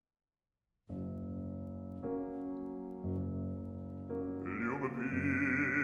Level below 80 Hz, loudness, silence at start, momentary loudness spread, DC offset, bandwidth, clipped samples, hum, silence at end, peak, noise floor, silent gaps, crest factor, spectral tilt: -62 dBFS; -39 LUFS; 0.9 s; 12 LU; under 0.1%; 9.2 kHz; under 0.1%; none; 0 s; -22 dBFS; under -90 dBFS; none; 18 dB; -9 dB/octave